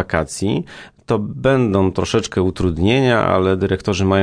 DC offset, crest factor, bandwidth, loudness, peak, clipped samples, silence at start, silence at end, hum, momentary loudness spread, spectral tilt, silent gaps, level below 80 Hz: under 0.1%; 16 dB; 10.5 kHz; -17 LUFS; -2 dBFS; under 0.1%; 0 s; 0 s; none; 7 LU; -6 dB/octave; none; -40 dBFS